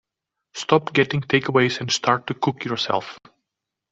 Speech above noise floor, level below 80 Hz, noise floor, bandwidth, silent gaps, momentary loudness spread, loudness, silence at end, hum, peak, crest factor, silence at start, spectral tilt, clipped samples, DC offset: 62 dB; -60 dBFS; -84 dBFS; 8 kHz; none; 9 LU; -21 LUFS; 0.75 s; none; -2 dBFS; 20 dB; 0.55 s; -4.5 dB/octave; under 0.1%; under 0.1%